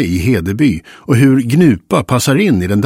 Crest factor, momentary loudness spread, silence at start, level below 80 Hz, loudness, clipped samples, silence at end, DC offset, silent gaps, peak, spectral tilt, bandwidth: 12 dB; 5 LU; 0 s; -38 dBFS; -12 LUFS; under 0.1%; 0 s; under 0.1%; none; 0 dBFS; -6.5 dB/octave; 16.5 kHz